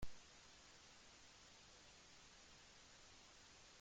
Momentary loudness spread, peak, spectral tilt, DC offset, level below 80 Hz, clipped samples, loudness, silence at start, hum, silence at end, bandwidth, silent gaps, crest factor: 0 LU; -36 dBFS; -2 dB/octave; under 0.1%; -70 dBFS; under 0.1%; -63 LUFS; 0 s; none; 0 s; 16 kHz; none; 22 dB